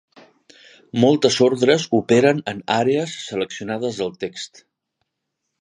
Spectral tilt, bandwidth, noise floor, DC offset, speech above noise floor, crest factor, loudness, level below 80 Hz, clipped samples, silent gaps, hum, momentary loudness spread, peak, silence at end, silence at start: -5 dB/octave; 10.5 kHz; -78 dBFS; under 0.1%; 59 dB; 20 dB; -19 LUFS; -62 dBFS; under 0.1%; none; none; 13 LU; -2 dBFS; 1.15 s; 0.95 s